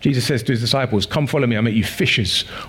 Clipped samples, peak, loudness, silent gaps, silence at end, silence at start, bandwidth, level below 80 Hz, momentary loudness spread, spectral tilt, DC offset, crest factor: under 0.1%; -4 dBFS; -18 LUFS; none; 0 s; 0 s; 17 kHz; -48 dBFS; 2 LU; -5 dB/octave; under 0.1%; 14 dB